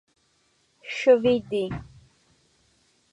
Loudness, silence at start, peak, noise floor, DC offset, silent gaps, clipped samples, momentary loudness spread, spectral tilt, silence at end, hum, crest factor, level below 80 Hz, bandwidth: -23 LUFS; 0.85 s; -6 dBFS; -67 dBFS; under 0.1%; none; under 0.1%; 18 LU; -6 dB/octave; 1.3 s; none; 20 dB; -56 dBFS; 8.2 kHz